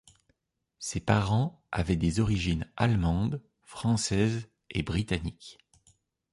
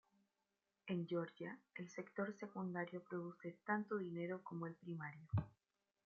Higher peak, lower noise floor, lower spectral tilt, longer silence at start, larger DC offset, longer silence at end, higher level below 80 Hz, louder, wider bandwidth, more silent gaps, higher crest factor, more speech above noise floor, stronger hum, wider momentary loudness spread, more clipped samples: first, -8 dBFS vs -26 dBFS; second, -77 dBFS vs -90 dBFS; about the same, -5.5 dB/octave vs -6.5 dB/octave; about the same, 0.8 s vs 0.85 s; neither; first, 0.8 s vs 0.55 s; first, -44 dBFS vs -76 dBFS; first, -29 LUFS vs -47 LUFS; first, 11.5 kHz vs 7 kHz; neither; about the same, 22 dB vs 20 dB; first, 49 dB vs 43 dB; neither; first, 13 LU vs 9 LU; neither